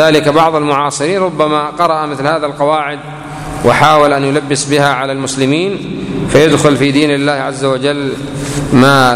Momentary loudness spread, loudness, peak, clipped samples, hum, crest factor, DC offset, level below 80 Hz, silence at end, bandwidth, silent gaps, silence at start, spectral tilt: 11 LU; -12 LUFS; 0 dBFS; 0.4%; none; 12 dB; under 0.1%; -38 dBFS; 0 s; 16 kHz; none; 0 s; -5 dB/octave